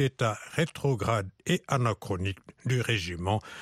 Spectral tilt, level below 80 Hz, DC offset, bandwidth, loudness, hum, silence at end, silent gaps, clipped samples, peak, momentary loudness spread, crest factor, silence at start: -5.5 dB/octave; -56 dBFS; under 0.1%; 14.5 kHz; -30 LUFS; none; 0 s; none; under 0.1%; -12 dBFS; 5 LU; 18 dB; 0 s